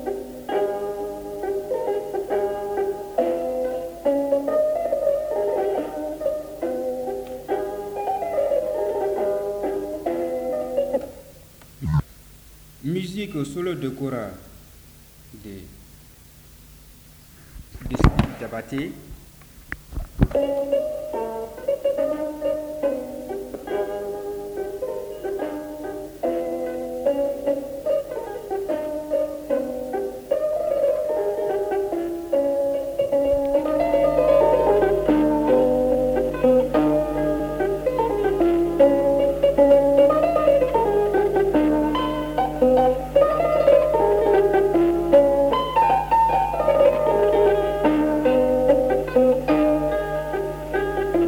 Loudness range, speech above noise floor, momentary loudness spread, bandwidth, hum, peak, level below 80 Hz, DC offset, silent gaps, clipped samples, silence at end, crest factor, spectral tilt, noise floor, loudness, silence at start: 11 LU; 21 dB; 13 LU; over 20 kHz; none; -4 dBFS; -40 dBFS; under 0.1%; none; under 0.1%; 0 s; 18 dB; -7 dB/octave; -47 dBFS; -22 LUFS; 0 s